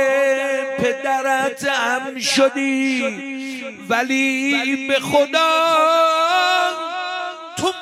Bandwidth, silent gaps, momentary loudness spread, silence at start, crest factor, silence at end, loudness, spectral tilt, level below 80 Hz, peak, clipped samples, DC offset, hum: 15.5 kHz; none; 10 LU; 0 s; 16 dB; 0 s; -18 LUFS; -2.5 dB/octave; -64 dBFS; -2 dBFS; under 0.1%; under 0.1%; none